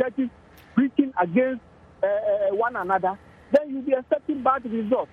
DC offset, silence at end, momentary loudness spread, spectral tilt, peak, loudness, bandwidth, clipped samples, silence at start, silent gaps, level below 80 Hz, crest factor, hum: under 0.1%; 0.1 s; 6 LU; -8.5 dB/octave; -6 dBFS; -24 LUFS; 6.2 kHz; under 0.1%; 0 s; none; -60 dBFS; 18 dB; none